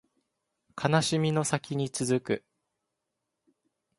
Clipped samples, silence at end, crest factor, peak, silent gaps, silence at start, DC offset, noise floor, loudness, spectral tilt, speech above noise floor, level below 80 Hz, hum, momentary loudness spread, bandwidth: under 0.1%; 1.6 s; 24 dB; -8 dBFS; none; 0.75 s; under 0.1%; -84 dBFS; -29 LUFS; -5 dB/octave; 56 dB; -66 dBFS; none; 9 LU; 11.5 kHz